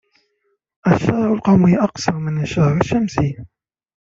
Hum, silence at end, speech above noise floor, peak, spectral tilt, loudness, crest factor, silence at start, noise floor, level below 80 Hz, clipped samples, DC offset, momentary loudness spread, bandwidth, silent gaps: none; 0.6 s; 52 dB; -2 dBFS; -7.5 dB/octave; -17 LUFS; 16 dB; 0.85 s; -68 dBFS; -44 dBFS; under 0.1%; under 0.1%; 9 LU; 7.6 kHz; none